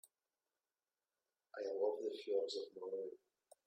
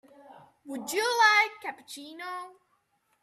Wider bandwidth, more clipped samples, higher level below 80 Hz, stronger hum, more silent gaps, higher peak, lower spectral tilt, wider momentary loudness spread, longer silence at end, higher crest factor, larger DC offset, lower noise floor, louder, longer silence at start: about the same, 14 kHz vs 15 kHz; neither; second, under -90 dBFS vs -84 dBFS; neither; neither; second, -28 dBFS vs -10 dBFS; first, -3 dB/octave vs 0 dB/octave; second, 12 LU vs 22 LU; second, 0.5 s vs 0.7 s; about the same, 18 dB vs 20 dB; neither; first, under -90 dBFS vs -73 dBFS; second, -43 LUFS vs -24 LUFS; first, 1.55 s vs 0.3 s